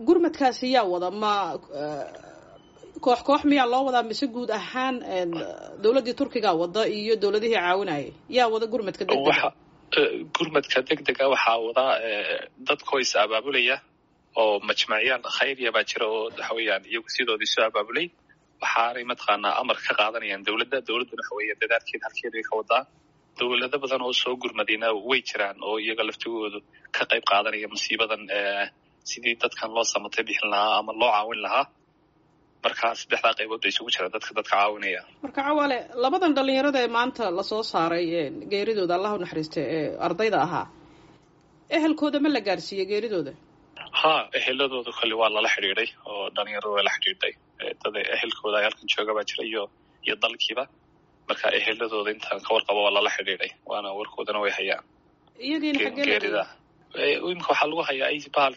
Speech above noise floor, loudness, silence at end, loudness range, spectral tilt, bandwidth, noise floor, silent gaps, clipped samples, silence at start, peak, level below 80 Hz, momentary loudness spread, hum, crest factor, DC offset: 37 dB; -25 LUFS; 0 s; 3 LU; -0.5 dB/octave; 8 kHz; -63 dBFS; none; under 0.1%; 0 s; -8 dBFS; -68 dBFS; 9 LU; none; 18 dB; under 0.1%